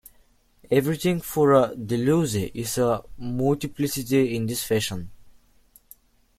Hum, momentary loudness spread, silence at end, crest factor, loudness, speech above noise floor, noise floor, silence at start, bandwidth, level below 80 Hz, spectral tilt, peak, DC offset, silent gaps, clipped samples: none; 9 LU; 1.1 s; 20 dB; -24 LUFS; 36 dB; -59 dBFS; 0.7 s; 16.5 kHz; -52 dBFS; -5.5 dB/octave; -6 dBFS; under 0.1%; none; under 0.1%